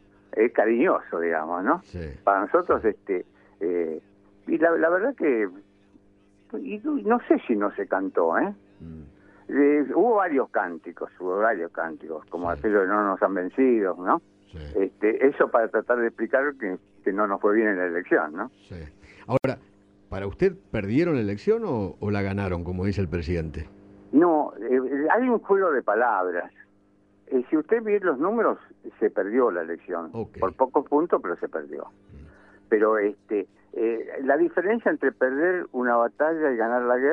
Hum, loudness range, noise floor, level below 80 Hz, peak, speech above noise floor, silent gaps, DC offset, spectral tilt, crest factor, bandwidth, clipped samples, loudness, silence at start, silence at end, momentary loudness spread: none; 3 LU; -61 dBFS; -52 dBFS; -6 dBFS; 37 dB; none; under 0.1%; -9 dB/octave; 18 dB; 6.6 kHz; under 0.1%; -24 LUFS; 0.35 s; 0 s; 13 LU